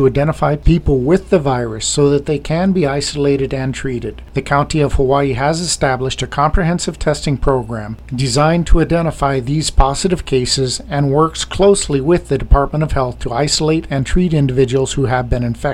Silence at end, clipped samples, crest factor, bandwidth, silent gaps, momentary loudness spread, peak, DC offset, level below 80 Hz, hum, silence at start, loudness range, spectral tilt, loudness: 0 s; under 0.1%; 14 dB; 13 kHz; none; 6 LU; 0 dBFS; under 0.1%; -22 dBFS; none; 0 s; 2 LU; -5.5 dB/octave; -16 LUFS